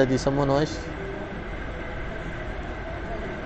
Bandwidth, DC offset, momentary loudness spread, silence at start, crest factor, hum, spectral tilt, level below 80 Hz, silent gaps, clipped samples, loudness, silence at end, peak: 8.8 kHz; under 0.1%; 11 LU; 0 s; 20 dB; none; -6 dB/octave; -38 dBFS; none; under 0.1%; -29 LUFS; 0 s; -6 dBFS